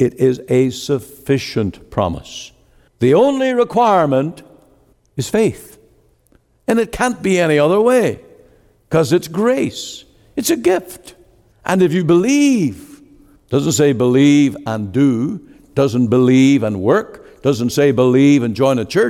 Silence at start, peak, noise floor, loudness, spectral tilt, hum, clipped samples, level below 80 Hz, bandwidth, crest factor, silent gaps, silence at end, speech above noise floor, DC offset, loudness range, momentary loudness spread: 0 s; -2 dBFS; -55 dBFS; -15 LUFS; -6 dB/octave; none; under 0.1%; -48 dBFS; 15.5 kHz; 12 dB; none; 0 s; 41 dB; under 0.1%; 5 LU; 15 LU